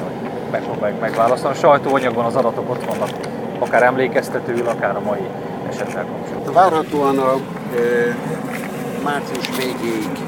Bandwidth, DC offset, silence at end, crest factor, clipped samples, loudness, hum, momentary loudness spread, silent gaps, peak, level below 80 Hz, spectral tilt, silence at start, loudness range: 19.5 kHz; under 0.1%; 0 s; 18 dB; under 0.1%; -19 LUFS; none; 11 LU; none; 0 dBFS; -56 dBFS; -5.5 dB/octave; 0 s; 2 LU